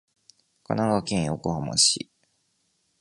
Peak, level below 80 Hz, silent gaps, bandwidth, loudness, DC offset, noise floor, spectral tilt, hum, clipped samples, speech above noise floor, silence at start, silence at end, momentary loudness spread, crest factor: -6 dBFS; -54 dBFS; none; 11.5 kHz; -24 LUFS; under 0.1%; -71 dBFS; -3.5 dB/octave; none; under 0.1%; 47 dB; 0.7 s; 1.05 s; 11 LU; 22 dB